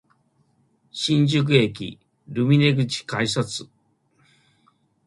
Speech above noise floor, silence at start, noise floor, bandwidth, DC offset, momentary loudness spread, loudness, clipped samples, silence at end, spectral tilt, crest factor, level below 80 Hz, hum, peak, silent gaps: 44 dB; 0.95 s; -64 dBFS; 11.5 kHz; under 0.1%; 16 LU; -21 LUFS; under 0.1%; 1.4 s; -5.5 dB/octave; 20 dB; -60 dBFS; none; -4 dBFS; none